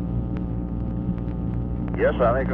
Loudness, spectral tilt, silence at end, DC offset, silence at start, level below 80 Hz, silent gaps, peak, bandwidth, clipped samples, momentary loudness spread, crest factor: -25 LUFS; -11 dB/octave; 0 s; under 0.1%; 0 s; -32 dBFS; none; -8 dBFS; 3.9 kHz; under 0.1%; 8 LU; 16 dB